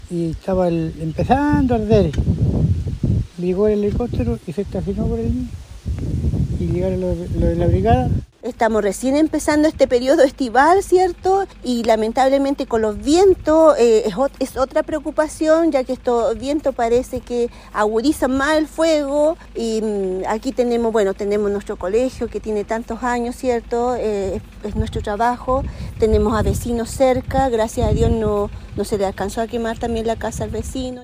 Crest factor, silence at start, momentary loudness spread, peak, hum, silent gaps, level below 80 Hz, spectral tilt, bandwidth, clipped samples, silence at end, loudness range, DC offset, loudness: 18 dB; 0.05 s; 9 LU; 0 dBFS; none; none; -30 dBFS; -6.5 dB/octave; 15.5 kHz; under 0.1%; 0 s; 6 LU; under 0.1%; -19 LUFS